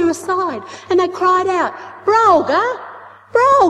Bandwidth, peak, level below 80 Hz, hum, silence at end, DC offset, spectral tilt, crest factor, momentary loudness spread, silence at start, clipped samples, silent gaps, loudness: 12.5 kHz; -2 dBFS; -60 dBFS; none; 0 s; under 0.1%; -4.5 dB/octave; 14 dB; 11 LU; 0 s; under 0.1%; none; -16 LUFS